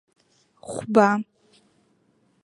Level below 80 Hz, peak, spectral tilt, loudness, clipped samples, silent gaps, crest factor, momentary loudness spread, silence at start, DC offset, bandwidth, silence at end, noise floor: -68 dBFS; -2 dBFS; -6.5 dB/octave; -22 LUFS; under 0.1%; none; 24 dB; 23 LU; 0.65 s; under 0.1%; 11.5 kHz; 1.2 s; -65 dBFS